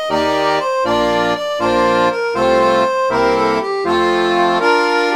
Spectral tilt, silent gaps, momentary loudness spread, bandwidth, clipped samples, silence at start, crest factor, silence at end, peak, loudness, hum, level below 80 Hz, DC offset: -4.5 dB/octave; none; 3 LU; 15.5 kHz; under 0.1%; 0 s; 12 dB; 0 s; -2 dBFS; -15 LUFS; none; -44 dBFS; under 0.1%